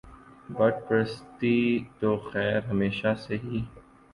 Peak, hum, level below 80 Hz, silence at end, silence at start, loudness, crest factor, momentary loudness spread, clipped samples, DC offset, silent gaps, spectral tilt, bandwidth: -10 dBFS; none; -54 dBFS; 0.3 s; 0.05 s; -27 LUFS; 18 dB; 9 LU; under 0.1%; under 0.1%; none; -8 dB/octave; 11 kHz